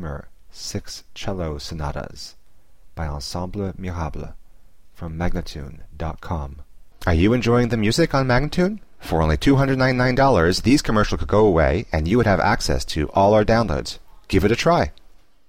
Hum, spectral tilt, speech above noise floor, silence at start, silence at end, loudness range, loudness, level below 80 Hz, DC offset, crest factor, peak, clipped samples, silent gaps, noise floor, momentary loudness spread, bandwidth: none; -6 dB/octave; 32 dB; 0 s; 0.55 s; 13 LU; -20 LUFS; -32 dBFS; 0.8%; 16 dB; -6 dBFS; under 0.1%; none; -51 dBFS; 17 LU; 16.5 kHz